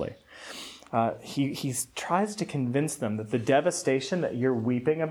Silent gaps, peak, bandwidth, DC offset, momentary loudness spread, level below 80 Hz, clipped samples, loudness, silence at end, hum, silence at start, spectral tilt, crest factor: none; -8 dBFS; 19 kHz; under 0.1%; 13 LU; -66 dBFS; under 0.1%; -28 LUFS; 0 s; none; 0 s; -5 dB/octave; 20 dB